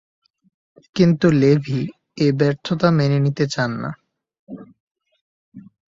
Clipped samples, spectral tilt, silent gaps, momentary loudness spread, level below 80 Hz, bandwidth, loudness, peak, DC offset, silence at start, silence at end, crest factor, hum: under 0.1%; -7.5 dB/octave; 4.39-4.47 s, 4.80-4.95 s, 5.21-5.52 s; 24 LU; -56 dBFS; 7.6 kHz; -19 LUFS; -2 dBFS; under 0.1%; 0.95 s; 0.35 s; 18 dB; none